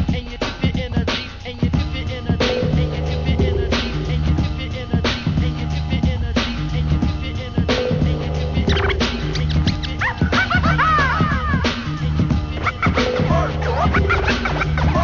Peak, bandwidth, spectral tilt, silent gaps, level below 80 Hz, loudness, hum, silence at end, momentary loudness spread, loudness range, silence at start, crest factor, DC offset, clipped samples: -6 dBFS; 7.2 kHz; -6.5 dB/octave; none; -24 dBFS; -20 LUFS; none; 0 s; 6 LU; 3 LU; 0 s; 14 dB; under 0.1%; under 0.1%